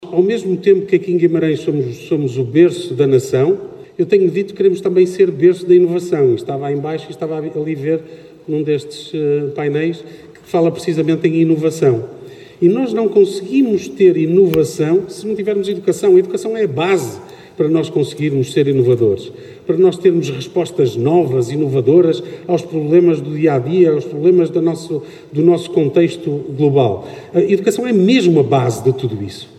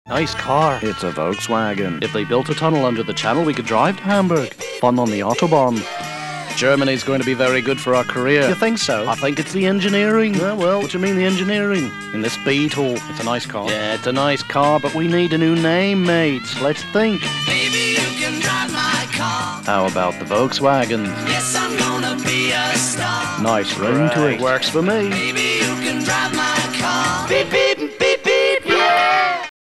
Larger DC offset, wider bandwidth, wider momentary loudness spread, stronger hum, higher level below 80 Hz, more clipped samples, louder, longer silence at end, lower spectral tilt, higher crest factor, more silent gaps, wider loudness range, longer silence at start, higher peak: neither; about the same, 13.5 kHz vs 13.5 kHz; first, 10 LU vs 6 LU; neither; about the same, -58 dBFS vs -54 dBFS; neither; first, -15 LUFS vs -18 LUFS; about the same, 0.15 s vs 0.15 s; first, -7.5 dB/octave vs -4 dB/octave; about the same, 14 dB vs 18 dB; neither; about the same, 4 LU vs 2 LU; about the same, 0 s vs 0.05 s; about the same, 0 dBFS vs 0 dBFS